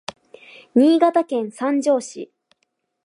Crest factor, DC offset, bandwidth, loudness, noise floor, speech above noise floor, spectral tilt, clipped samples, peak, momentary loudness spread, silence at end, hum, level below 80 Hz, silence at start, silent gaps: 18 dB; under 0.1%; 11 kHz; -19 LUFS; -72 dBFS; 54 dB; -4.5 dB/octave; under 0.1%; -4 dBFS; 22 LU; 0.8 s; none; -74 dBFS; 0.75 s; none